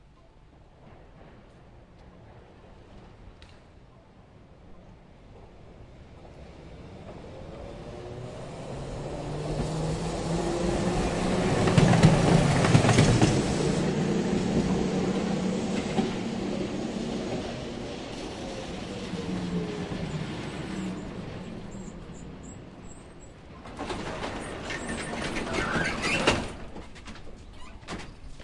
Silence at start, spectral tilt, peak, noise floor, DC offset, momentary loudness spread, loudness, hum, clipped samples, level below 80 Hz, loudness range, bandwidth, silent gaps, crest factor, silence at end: 0.6 s; -5.5 dB/octave; -6 dBFS; -54 dBFS; under 0.1%; 24 LU; -28 LUFS; none; under 0.1%; -44 dBFS; 18 LU; 11.5 kHz; none; 24 dB; 0 s